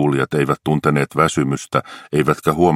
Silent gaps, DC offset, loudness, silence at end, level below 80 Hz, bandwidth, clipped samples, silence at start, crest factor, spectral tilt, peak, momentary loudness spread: none; under 0.1%; -18 LUFS; 0 s; -46 dBFS; 15.5 kHz; under 0.1%; 0 s; 16 dB; -6.5 dB/octave; 0 dBFS; 5 LU